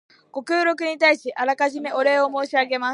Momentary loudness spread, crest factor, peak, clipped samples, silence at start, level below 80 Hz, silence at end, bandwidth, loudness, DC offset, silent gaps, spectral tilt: 6 LU; 16 dB; -4 dBFS; under 0.1%; 0.35 s; -82 dBFS; 0 s; 11 kHz; -21 LUFS; under 0.1%; none; -2 dB/octave